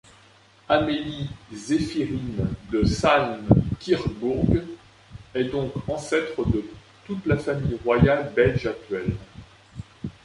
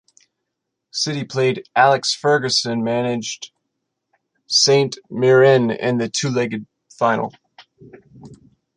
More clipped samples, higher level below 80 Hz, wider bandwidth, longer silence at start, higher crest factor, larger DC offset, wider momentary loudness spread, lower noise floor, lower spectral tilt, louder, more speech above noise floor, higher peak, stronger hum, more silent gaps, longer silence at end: neither; first, -40 dBFS vs -64 dBFS; about the same, 11.5 kHz vs 10.5 kHz; second, 0.7 s vs 0.95 s; about the same, 22 dB vs 18 dB; neither; first, 17 LU vs 13 LU; second, -54 dBFS vs -79 dBFS; first, -7 dB/octave vs -4 dB/octave; second, -24 LUFS vs -18 LUFS; second, 31 dB vs 61 dB; about the same, -2 dBFS vs -2 dBFS; neither; neither; second, 0.15 s vs 0.4 s